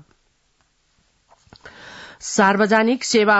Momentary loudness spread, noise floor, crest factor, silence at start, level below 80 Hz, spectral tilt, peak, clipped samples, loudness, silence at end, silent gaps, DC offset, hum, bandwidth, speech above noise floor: 24 LU; -64 dBFS; 18 dB; 1.65 s; -62 dBFS; -3.5 dB/octave; -4 dBFS; under 0.1%; -17 LUFS; 0 s; none; under 0.1%; none; 8 kHz; 48 dB